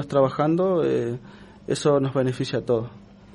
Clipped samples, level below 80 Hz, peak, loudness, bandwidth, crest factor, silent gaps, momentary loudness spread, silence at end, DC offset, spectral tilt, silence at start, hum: under 0.1%; -56 dBFS; -8 dBFS; -23 LUFS; 11.5 kHz; 16 dB; none; 11 LU; 0.35 s; under 0.1%; -6.5 dB/octave; 0 s; none